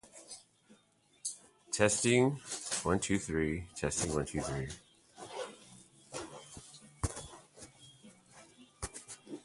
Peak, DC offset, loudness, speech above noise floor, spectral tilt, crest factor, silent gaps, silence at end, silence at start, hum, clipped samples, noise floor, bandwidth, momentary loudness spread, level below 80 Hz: -12 dBFS; under 0.1%; -35 LUFS; 36 dB; -4 dB/octave; 26 dB; none; 0.05 s; 0.05 s; none; under 0.1%; -69 dBFS; 11.5 kHz; 24 LU; -54 dBFS